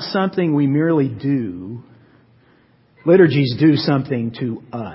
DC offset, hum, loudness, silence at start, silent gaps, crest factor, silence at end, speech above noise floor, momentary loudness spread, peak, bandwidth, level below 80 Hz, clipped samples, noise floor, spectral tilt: under 0.1%; none; -17 LUFS; 0 s; none; 16 dB; 0 s; 37 dB; 15 LU; -2 dBFS; 5.8 kHz; -56 dBFS; under 0.1%; -54 dBFS; -11.5 dB/octave